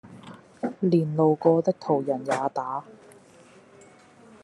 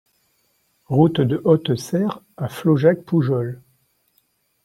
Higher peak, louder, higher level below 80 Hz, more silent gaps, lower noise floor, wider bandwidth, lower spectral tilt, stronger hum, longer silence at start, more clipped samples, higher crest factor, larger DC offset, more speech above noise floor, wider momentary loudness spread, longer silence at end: second, -6 dBFS vs -2 dBFS; second, -25 LUFS vs -20 LUFS; second, -74 dBFS vs -60 dBFS; neither; second, -53 dBFS vs -65 dBFS; second, 11.5 kHz vs 15 kHz; about the same, -8 dB/octave vs -7.5 dB/octave; neither; second, 0.05 s vs 0.9 s; neither; about the same, 20 dB vs 18 dB; neither; second, 29 dB vs 47 dB; first, 17 LU vs 13 LU; first, 1.5 s vs 1.1 s